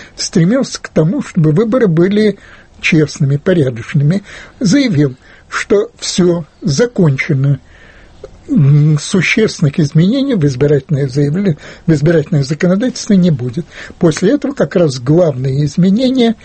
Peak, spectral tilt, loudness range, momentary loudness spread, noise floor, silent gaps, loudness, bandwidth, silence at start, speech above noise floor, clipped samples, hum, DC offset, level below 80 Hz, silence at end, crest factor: 0 dBFS; -6.5 dB/octave; 2 LU; 6 LU; -39 dBFS; none; -12 LUFS; 8.8 kHz; 0 s; 27 dB; under 0.1%; none; under 0.1%; -42 dBFS; 0.1 s; 12 dB